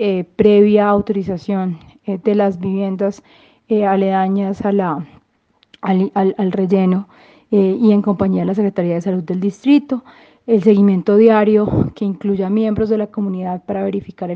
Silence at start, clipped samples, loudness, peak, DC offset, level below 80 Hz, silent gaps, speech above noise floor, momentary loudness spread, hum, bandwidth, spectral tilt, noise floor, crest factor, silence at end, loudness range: 0 s; under 0.1%; -16 LUFS; 0 dBFS; under 0.1%; -48 dBFS; none; 44 dB; 11 LU; none; 6.6 kHz; -9 dB/octave; -59 dBFS; 16 dB; 0 s; 4 LU